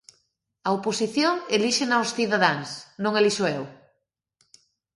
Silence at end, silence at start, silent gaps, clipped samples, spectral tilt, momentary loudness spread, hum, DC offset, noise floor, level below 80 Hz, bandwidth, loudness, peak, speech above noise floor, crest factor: 1.2 s; 0.65 s; none; under 0.1%; -3.5 dB/octave; 10 LU; none; under 0.1%; -75 dBFS; -70 dBFS; 11.5 kHz; -24 LUFS; -4 dBFS; 52 dB; 22 dB